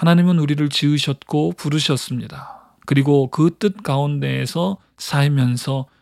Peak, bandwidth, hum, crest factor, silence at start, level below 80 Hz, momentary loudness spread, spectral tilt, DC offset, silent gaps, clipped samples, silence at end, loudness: -2 dBFS; 14.5 kHz; none; 16 dB; 0 s; -60 dBFS; 12 LU; -6 dB/octave; under 0.1%; none; under 0.1%; 0.2 s; -19 LUFS